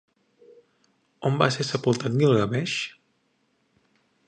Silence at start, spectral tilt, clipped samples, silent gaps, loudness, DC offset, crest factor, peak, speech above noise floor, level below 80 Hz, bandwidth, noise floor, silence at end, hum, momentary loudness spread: 1.2 s; -5.5 dB/octave; under 0.1%; none; -24 LUFS; under 0.1%; 26 dB; -2 dBFS; 47 dB; -62 dBFS; 9.8 kHz; -70 dBFS; 1.35 s; none; 9 LU